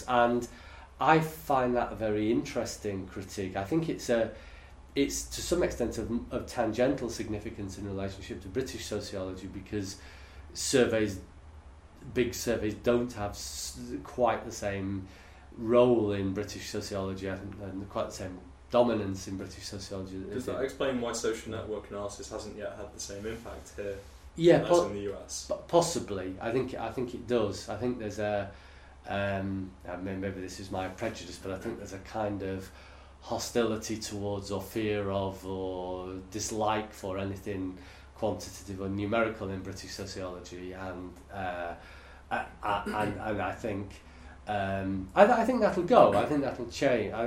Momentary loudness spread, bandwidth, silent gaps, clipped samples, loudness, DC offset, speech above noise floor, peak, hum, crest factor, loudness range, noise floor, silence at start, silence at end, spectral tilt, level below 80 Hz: 15 LU; 16 kHz; none; under 0.1%; -32 LUFS; under 0.1%; 20 dB; -6 dBFS; none; 26 dB; 7 LU; -51 dBFS; 0 s; 0 s; -5 dB/octave; -52 dBFS